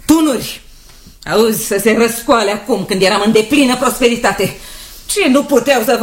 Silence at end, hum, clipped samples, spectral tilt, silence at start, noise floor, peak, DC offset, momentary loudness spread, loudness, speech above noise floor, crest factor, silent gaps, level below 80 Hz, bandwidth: 0 s; none; under 0.1%; -3.5 dB/octave; 0.05 s; -39 dBFS; 0 dBFS; under 0.1%; 13 LU; -13 LUFS; 26 dB; 14 dB; none; -40 dBFS; 16.5 kHz